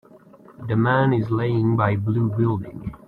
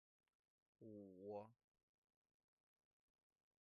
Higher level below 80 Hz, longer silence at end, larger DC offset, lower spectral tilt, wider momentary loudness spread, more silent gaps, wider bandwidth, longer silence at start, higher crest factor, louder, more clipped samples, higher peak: first, -52 dBFS vs under -90 dBFS; second, 0.1 s vs 2.1 s; neither; first, -10 dB/octave vs -7 dB/octave; about the same, 9 LU vs 11 LU; neither; first, 4.4 kHz vs 3.5 kHz; second, 0.5 s vs 0.8 s; second, 16 dB vs 22 dB; first, -21 LUFS vs -59 LUFS; neither; first, -6 dBFS vs -42 dBFS